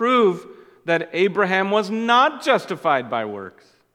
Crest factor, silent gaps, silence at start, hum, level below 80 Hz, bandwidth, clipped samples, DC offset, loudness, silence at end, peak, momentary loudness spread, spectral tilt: 18 dB; none; 0 s; none; -76 dBFS; 13.5 kHz; under 0.1%; under 0.1%; -20 LUFS; 0.45 s; -2 dBFS; 15 LU; -5 dB/octave